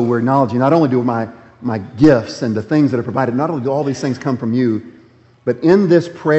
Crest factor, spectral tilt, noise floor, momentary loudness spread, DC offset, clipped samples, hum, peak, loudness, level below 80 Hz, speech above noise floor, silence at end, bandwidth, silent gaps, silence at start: 16 dB; -8 dB/octave; -47 dBFS; 11 LU; under 0.1%; under 0.1%; none; 0 dBFS; -16 LUFS; -52 dBFS; 32 dB; 0 s; 8.2 kHz; none; 0 s